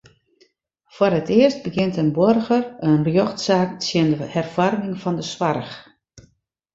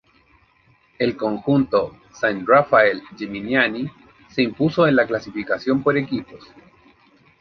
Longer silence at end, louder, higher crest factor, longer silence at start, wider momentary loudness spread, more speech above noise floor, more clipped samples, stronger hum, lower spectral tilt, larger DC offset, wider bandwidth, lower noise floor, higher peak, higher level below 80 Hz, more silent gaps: second, 0.55 s vs 1.05 s; about the same, -20 LUFS vs -20 LUFS; about the same, 18 dB vs 20 dB; about the same, 0.95 s vs 1 s; second, 8 LU vs 13 LU; first, 42 dB vs 38 dB; neither; neither; about the same, -6.5 dB/octave vs -7 dB/octave; neither; first, 8 kHz vs 6.6 kHz; about the same, -61 dBFS vs -58 dBFS; about the same, -2 dBFS vs -2 dBFS; about the same, -56 dBFS vs -56 dBFS; neither